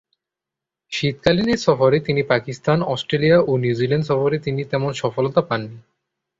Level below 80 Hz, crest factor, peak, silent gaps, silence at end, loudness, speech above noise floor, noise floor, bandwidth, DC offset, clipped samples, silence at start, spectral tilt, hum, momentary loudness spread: -52 dBFS; 18 dB; -2 dBFS; none; 0.6 s; -19 LUFS; 67 dB; -86 dBFS; 7.8 kHz; under 0.1%; under 0.1%; 0.9 s; -6.5 dB/octave; none; 7 LU